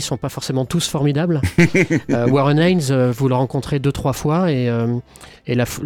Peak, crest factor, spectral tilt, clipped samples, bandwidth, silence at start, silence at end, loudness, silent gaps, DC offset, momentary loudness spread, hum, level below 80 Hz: -4 dBFS; 14 dB; -6 dB/octave; under 0.1%; 17.5 kHz; 0 s; 0 s; -18 LUFS; none; under 0.1%; 8 LU; none; -42 dBFS